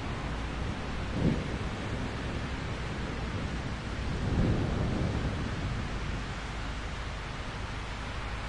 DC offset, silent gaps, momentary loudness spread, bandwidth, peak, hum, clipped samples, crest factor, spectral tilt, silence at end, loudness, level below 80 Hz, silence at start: under 0.1%; none; 7 LU; 11 kHz; -16 dBFS; none; under 0.1%; 18 dB; -6 dB/octave; 0 s; -34 LUFS; -38 dBFS; 0 s